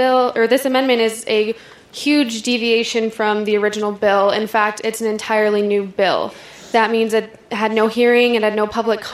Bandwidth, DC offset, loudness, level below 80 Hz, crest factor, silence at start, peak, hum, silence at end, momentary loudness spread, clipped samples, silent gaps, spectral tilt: 15 kHz; under 0.1%; -17 LUFS; -60 dBFS; 16 dB; 0 s; -2 dBFS; none; 0 s; 7 LU; under 0.1%; none; -3.5 dB/octave